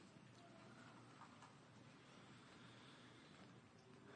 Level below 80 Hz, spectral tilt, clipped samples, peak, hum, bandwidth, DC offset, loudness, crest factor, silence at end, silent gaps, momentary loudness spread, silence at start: under -90 dBFS; -4.5 dB/octave; under 0.1%; -48 dBFS; none; 9.6 kHz; under 0.1%; -64 LUFS; 16 dB; 0 s; none; 3 LU; 0 s